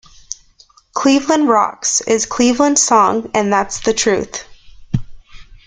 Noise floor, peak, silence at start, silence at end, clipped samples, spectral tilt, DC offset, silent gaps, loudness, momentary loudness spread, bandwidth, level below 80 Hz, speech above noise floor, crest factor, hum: -50 dBFS; 0 dBFS; 0.95 s; 0.15 s; under 0.1%; -3.5 dB/octave; under 0.1%; none; -14 LUFS; 16 LU; 10 kHz; -42 dBFS; 35 dB; 16 dB; none